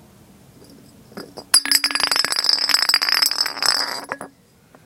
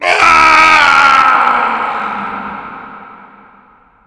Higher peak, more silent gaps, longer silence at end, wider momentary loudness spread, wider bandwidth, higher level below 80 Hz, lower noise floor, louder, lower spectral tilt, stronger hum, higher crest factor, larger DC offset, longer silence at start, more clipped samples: about the same, 0 dBFS vs 0 dBFS; neither; second, 0.55 s vs 0.95 s; second, 17 LU vs 20 LU; first, 17 kHz vs 11 kHz; second, -64 dBFS vs -44 dBFS; first, -52 dBFS vs -46 dBFS; second, -16 LUFS vs -7 LUFS; second, 1.5 dB/octave vs -1.5 dB/octave; neither; first, 22 dB vs 12 dB; neither; first, 1.15 s vs 0 s; second, under 0.1% vs 2%